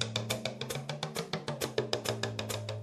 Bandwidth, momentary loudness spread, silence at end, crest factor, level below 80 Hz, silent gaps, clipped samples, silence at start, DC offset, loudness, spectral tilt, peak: 13.5 kHz; 4 LU; 0 s; 24 dB; -64 dBFS; none; under 0.1%; 0 s; under 0.1%; -36 LUFS; -4 dB/octave; -12 dBFS